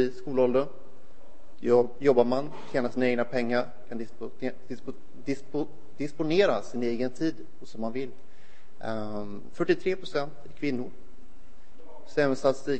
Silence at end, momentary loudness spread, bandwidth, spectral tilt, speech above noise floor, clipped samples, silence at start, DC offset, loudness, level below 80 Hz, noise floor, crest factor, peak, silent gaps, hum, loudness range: 0 s; 16 LU; 8.8 kHz; -6.5 dB/octave; 30 dB; under 0.1%; 0 s; 3%; -29 LUFS; -60 dBFS; -58 dBFS; 22 dB; -8 dBFS; none; none; 6 LU